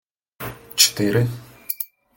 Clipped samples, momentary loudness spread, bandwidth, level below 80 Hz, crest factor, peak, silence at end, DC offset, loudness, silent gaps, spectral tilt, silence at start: under 0.1%; 19 LU; 17 kHz; -54 dBFS; 24 dB; 0 dBFS; 0.3 s; under 0.1%; -20 LUFS; none; -3 dB/octave; 0.4 s